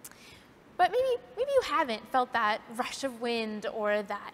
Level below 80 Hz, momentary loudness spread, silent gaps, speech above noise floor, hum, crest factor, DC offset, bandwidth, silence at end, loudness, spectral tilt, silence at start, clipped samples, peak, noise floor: -66 dBFS; 7 LU; none; 25 dB; none; 18 dB; under 0.1%; 16 kHz; 0 s; -30 LUFS; -3.5 dB/octave; 0.05 s; under 0.1%; -14 dBFS; -55 dBFS